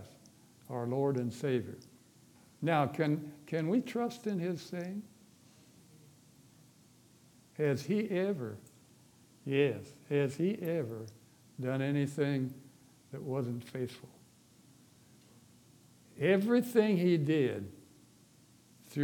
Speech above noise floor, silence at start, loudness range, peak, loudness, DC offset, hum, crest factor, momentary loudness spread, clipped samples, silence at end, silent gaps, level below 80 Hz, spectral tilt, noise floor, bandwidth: 30 dB; 0 s; 10 LU; -14 dBFS; -34 LUFS; under 0.1%; none; 22 dB; 17 LU; under 0.1%; 0 s; none; -80 dBFS; -7 dB/octave; -63 dBFS; 19 kHz